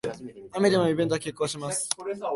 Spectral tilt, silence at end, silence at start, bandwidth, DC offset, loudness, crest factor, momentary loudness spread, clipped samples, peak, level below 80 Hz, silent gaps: -4.5 dB/octave; 0 s; 0.05 s; 12 kHz; under 0.1%; -27 LUFS; 22 dB; 13 LU; under 0.1%; -4 dBFS; -64 dBFS; none